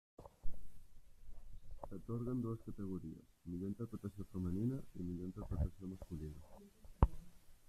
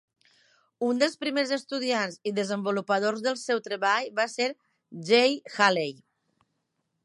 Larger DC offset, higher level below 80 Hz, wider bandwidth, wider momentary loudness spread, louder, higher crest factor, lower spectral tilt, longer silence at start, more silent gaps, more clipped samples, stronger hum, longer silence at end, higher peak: neither; first, -48 dBFS vs -84 dBFS; first, 14 kHz vs 11.5 kHz; first, 23 LU vs 8 LU; second, -44 LUFS vs -26 LUFS; first, 28 dB vs 22 dB; first, -9.5 dB/octave vs -3.5 dB/octave; second, 0.2 s vs 0.8 s; neither; neither; neither; second, 0.1 s vs 1.1 s; second, -14 dBFS vs -6 dBFS